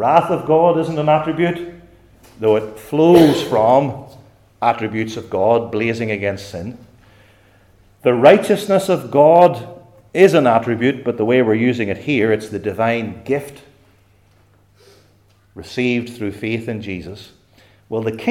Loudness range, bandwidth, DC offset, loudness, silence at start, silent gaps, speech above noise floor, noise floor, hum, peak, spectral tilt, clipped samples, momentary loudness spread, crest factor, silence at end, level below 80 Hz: 11 LU; 16.5 kHz; under 0.1%; -16 LUFS; 0 s; none; 38 dB; -54 dBFS; none; 0 dBFS; -6.5 dB/octave; under 0.1%; 16 LU; 18 dB; 0 s; -54 dBFS